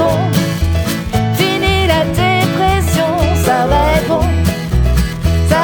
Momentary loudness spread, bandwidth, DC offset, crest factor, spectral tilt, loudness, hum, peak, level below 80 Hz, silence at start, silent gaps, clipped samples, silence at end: 4 LU; 19.5 kHz; under 0.1%; 12 dB; -5.5 dB/octave; -14 LUFS; none; 0 dBFS; -20 dBFS; 0 s; none; under 0.1%; 0 s